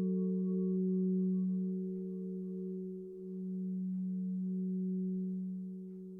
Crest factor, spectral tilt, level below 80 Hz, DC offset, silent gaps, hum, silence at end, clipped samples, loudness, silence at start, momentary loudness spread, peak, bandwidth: 10 dB; -14.5 dB/octave; -78 dBFS; under 0.1%; none; none; 0 s; under 0.1%; -37 LUFS; 0 s; 10 LU; -26 dBFS; 1.2 kHz